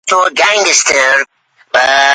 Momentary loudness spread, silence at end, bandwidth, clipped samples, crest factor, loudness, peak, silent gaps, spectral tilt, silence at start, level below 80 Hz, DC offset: 6 LU; 0 s; 16 kHz; under 0.1%; 10 dB; -9 LUFS; 0 dBFS; none; 1.5 dB/octave; 0.05 s; -56 dBFS; under 0.1%